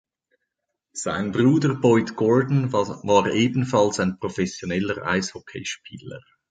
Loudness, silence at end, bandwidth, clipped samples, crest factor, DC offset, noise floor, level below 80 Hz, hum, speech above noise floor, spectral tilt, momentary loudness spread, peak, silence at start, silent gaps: -22 LUFS; 0.3 s; 9.4 kHz; under 0.1%; 18 dB; under 0.1%; -81 dBFS; -54 dBFS; none; 59 dB; -6 dB/octave; 14 LU; -4 dBFS; 0.95 s; none